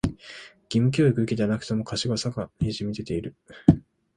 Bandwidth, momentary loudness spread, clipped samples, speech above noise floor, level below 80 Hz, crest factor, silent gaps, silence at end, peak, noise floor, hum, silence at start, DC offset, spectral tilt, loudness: 11 kHz; 13 LU; under 0.1%; 21 dB; -44 dBFS; 24 dB; none; 0.35 s; 0 dBFS; -46 dBFS; none; 0.05 s; under 0.1%; -6.5 dB/octave; -25 LUFS